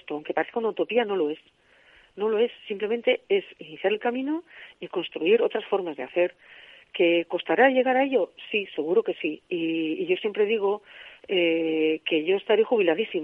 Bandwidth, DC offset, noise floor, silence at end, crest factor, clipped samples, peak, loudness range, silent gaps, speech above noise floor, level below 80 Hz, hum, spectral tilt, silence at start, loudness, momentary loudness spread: 4 kHz; under 0.1%; -57 dBFS; 0 s; 20 dB; under 0.1%; -6 dBFS; 4 LU; none; 32 dB; -76 dBFS; none; -7 dB/octave; 0.1 s; -25 LUFS; 9 LU